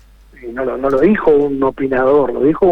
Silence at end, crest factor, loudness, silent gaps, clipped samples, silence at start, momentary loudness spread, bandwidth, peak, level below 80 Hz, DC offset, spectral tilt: 0 s; 12 dB; -14 LUFS; none; under 0.1%; 0.4 s; 10 LU; 4.9 kHz; -2 dBFS; -40 dBFS; under 0.1%; -9 dB/octave